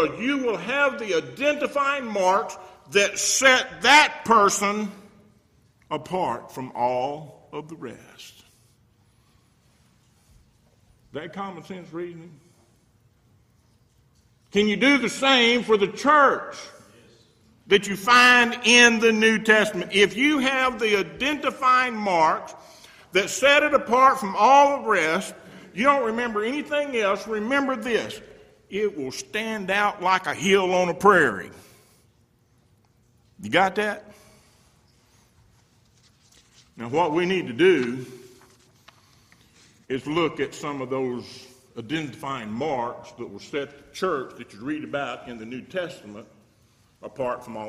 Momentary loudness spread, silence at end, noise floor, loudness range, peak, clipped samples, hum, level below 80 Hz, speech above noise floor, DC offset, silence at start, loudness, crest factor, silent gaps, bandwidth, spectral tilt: 20 LU; 0 s; -62 dBFS; 15 LU; -2 dBFS; under 0.1%; none; -62 dBFS; 40 dB; under 0.1%; 0 s; -21 LUFS; 22 dB; none; 15.5 kHz; -3 dB/octave